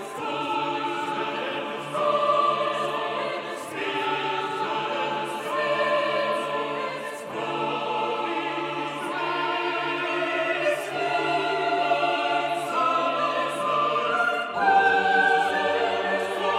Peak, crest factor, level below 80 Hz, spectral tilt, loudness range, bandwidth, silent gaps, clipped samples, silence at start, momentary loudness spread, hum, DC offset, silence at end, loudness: -8 dBFS; 18 dB; -76 dBFS; -3.5 dB/octave; 5 LU; 15.5 kHz; none; under 0.1%; 0 s; 8 LU; none; under 0.1%; 0 s; -25 LUFS